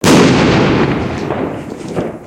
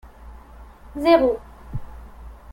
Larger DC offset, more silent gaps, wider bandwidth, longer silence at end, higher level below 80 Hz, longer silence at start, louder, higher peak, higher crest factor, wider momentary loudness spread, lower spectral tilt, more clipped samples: neither; neither; about the same, 17 kHz vs 16.5 kHz; second, 0 s vs 0.2 s; first, -34 dBFS vs -40 dBFS; second, 0 s vs 0.2 s; first, -13 LUFS vs -19 LUFS; about the same, 0 dBFS vs -2 dBFS; second, 12 dB vs 22 dB; second, 14 LU vs 27 LU; second, -5.5 dB/octave vs -7 dB/octave; neither